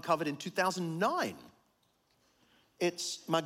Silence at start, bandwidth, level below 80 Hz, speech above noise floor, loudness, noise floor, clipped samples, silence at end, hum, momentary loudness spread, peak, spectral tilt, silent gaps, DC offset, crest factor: 0.05 s; 16.5 kHz; -80 dBFS; 40 dB; -34 LUFS; -73 dBFS; under 0.1%; 0 s; none; 6 LU; -16 dBFS; -4 dB/octave; none; under 0.1%; 20 dB